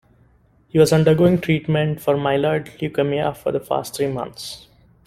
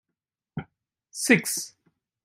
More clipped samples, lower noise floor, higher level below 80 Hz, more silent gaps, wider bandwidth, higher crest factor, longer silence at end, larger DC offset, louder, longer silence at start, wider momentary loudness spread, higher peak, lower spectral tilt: neither; second, -56 dBFS vs -86 dBFS; first, -50 dBFS vs -68 dBFS; neither; about the same, 15.5 kHz vs 16 kHz; second, 18 dB vs 24 dB; about the same, 0.5 s vs 0.55 s; neither; first, -19 LUFS vs -23 LUFS; first, 0.75 s vs 0.55 s; second, 13 LU vs 19 LU; about the same, -2 dBFS vs -4 dBFS; first, -6.5 dB/octave vs -3.5 dB/octave